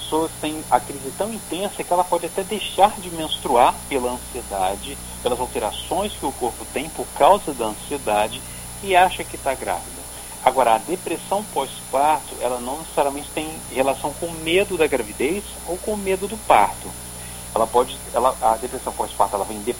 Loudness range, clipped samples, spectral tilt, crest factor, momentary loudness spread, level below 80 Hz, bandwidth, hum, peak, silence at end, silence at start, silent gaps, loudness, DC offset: 2 LU; under 0.1%; -3.5 dB/octave; 22 dB; 11 LU; -44 dBFS; 17 kHz; 60 Hz at -45 dBFS; 0 dBFS; 0 s; 0 s; none; -22 LUFS; under 0.1%